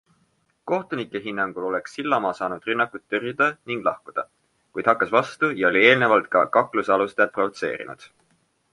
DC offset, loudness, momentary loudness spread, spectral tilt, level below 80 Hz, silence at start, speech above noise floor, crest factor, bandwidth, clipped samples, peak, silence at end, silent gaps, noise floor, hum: under 0.1%; -22 LUFS; 14 LU; -5.5 dB/octave; -66 dBFS; 0.65 s; 44 dB; 22 dB; 11.5 kHz; under 0.1%; -2 dBFS; 0.65 s; none; -67 dBFS; none